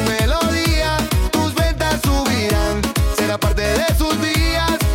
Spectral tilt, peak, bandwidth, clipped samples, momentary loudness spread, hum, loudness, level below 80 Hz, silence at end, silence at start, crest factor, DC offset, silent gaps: -4.5 dB/octave; -4 dBFS; 17 kHz; under 0.1%; 2 LU; none; -18 LUFS; -22 dBFS; 0 s; 0 s; 12 dB; under 0.1%; none